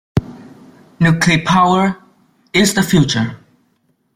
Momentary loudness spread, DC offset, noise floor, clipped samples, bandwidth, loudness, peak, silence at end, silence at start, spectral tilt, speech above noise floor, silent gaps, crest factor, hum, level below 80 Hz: 10 LU; under 0.1%; -62 dBFS; under 0.1%; 16 kHz; -14 LUFS; 0 dBFS; 0.8 s; 0.15 s; -5 dB/octave; 49 dB; none; 16 dB; none; -44 dBFS